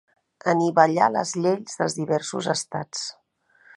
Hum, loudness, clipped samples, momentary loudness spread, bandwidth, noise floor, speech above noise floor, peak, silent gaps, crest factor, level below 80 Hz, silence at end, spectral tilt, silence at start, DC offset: none; -23 LUFS; under 0.1%; 12 LU; 11.5 kHz; -59 dBFS; 37 dB; -2 dBFS; none; 22 dB; -72 dBFS; 0.65 s; -4.5 dB/octave; 0.45 s; under 0.1%